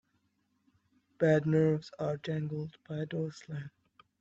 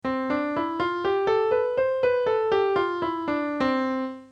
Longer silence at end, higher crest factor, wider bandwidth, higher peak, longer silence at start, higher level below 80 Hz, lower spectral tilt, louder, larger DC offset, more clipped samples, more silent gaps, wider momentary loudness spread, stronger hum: first, 0.55 s vs 0.05 s; first, 20 dB vs 12 dB; about the same, 7.8 kHz vs 7.4 kHz; about the same, -14 dBFS vs -12 dBFS; first, 1.2 s vs 0.05 s; second, -72 dBFS vs -58 dBFS; first, -8 dB/octave vs -6.5 dB/octave; second, -32 LUFS vs -25 LUFS; neither; neither; neither; first, 16 LU vs 5 LU; neither